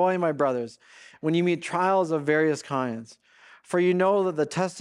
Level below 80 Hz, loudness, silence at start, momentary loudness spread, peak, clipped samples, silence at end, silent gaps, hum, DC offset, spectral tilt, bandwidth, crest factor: -74 dBFS; -25 LUFS; 0 s; 10 LU; -10 dBFS; under 0.1%; 0 s; none; none; under 0.1%; -6 dB/octave; 11 kHz; 14 dB